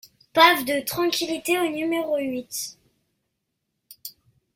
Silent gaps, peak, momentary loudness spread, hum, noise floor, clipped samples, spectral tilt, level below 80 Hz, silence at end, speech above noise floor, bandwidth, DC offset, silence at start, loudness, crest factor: none; -2 dBFS; 24 LU; none; -78 dBFS; under 0.1%; -2 dB/octave; -66 dBFS; 0.45 s; 56 dB; 16.5 kHz; under 0.1%; 0.35 s; -22 LUFS; 24 dB